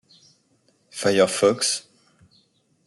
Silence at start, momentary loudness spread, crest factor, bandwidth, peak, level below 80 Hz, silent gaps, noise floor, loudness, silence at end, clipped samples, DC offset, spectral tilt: 0.95 s; 10 LU; 20 dB; 12 kHz; -6 dBFS; -70 dBFS; none; -64 dBFS; -21 LUFS; 1.05 s; under 0.1%; under 0.1%; -3 dB/octave